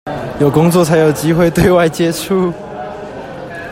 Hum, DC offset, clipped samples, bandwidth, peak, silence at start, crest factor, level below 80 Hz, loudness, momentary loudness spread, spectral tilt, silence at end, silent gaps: none; under 0.1%; under 0.1%; 16.5 kHz; 0 dBFS; 0.05 s; 14 dB; -36 dBFS; -12 LUFS; 16 LU; -6 dB/octave; 0 s; none